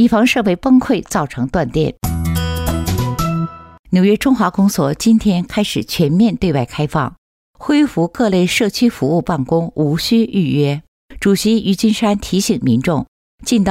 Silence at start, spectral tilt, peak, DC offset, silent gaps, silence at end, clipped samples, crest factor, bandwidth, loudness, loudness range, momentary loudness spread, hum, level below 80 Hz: 0 s; -6 dB/octave; -4 dBFS; under 0.1%; 3.79-3.84 s, 7.18-7.54 s, 10.88-11.09 s, 13.08-13.38 s; 0 s; under 0.1%; 12 dB; 16 kHz; -16 LUFS; 2 LU; 6 LU; none; -36 dBFS